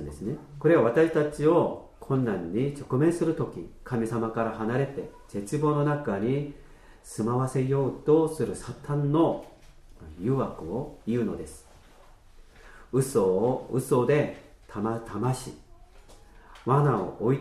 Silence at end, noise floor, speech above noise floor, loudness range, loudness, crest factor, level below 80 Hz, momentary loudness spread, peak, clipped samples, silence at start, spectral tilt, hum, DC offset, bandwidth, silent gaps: 0 s; -53 dBFS; 27 dB; 4 LU; -27 LUFS; 18 dB; -52 dBFS; 13 LU; -10 dBFS; under 0.1%; 0 s; -7.5 dB/octave; none; under 0.1%; 13.5 kHz; none